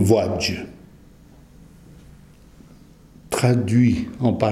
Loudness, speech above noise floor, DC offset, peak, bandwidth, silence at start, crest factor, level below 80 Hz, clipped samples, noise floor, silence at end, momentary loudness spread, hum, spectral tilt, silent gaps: -20 LUFS; 29 dB; under 0.1%; -2 dBFS; 14.5 kHz; 0 s; 20 dB; -48 dBFS; under 0.1%; -48 dBFS; 0 s; 11 LU; none; -6.5 dB/octave; none